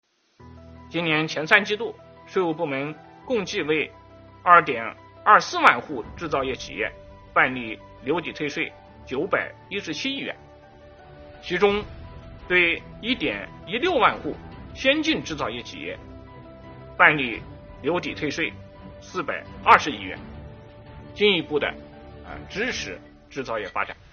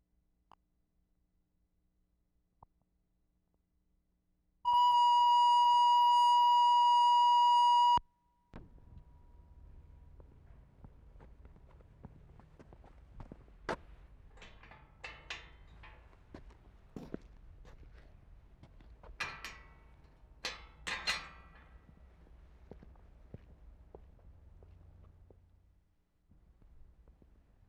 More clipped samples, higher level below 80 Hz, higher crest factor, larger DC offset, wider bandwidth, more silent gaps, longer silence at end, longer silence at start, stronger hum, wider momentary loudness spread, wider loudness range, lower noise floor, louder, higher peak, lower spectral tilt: neither; first, -50 dBFS vs -60 dBFS; first, 26 dB vs 16 dB; neither; second, 7 kHz vs 11 kHz; neither; second, 0.2 s vs 6.4 s; second, 0.4 s vs 4.65 s; neither; about the same, 24 LU vs 24 LU; second, 7 LU vs 25 LU; second, -50 dBFS vs -78 dBFS; first, -23 LUFS vs -28 LUFS; first, 0 dBFS vs -18 dBFS; about the same, -2 dB/octave vs -2 dB/octave